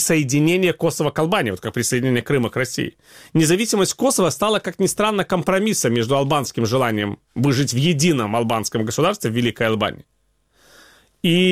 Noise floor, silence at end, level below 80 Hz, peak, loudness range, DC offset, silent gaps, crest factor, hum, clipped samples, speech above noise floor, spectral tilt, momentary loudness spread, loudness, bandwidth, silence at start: -60 dBFS; 0 s; -52 dBFS; -2 dBFS; 2 LU; 0.2%; none; 16 dB; none; under 0.1%; 41 dB; -4.5 dB/octave; 6 LU; -19 LUFS; 16.5 kHz; 0 s